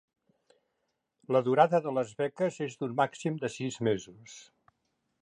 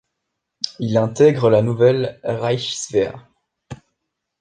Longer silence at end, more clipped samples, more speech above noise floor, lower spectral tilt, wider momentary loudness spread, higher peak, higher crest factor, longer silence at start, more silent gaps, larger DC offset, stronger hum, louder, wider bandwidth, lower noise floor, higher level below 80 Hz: first, 0.8 s vs 0.65 s; neither; second, 51 dB vs 61 dB; about the same, -6 dB/octave vs -5.5 dB/octave; first, 19 LU vs 11 LU; second, -8 dBFS vs -2 dBFS; about the same, 22 dB vs 18 dB; first, 1.3 s vs 0.65 s; neither; neither; neither; second, -30 LUFS vs -18 LUFS; about the same, 10.5 kHz vs 9.8 kHz; about the same, -81 dBFS vs -78 dBFS; second, -74 dBFS vs -56 dBFS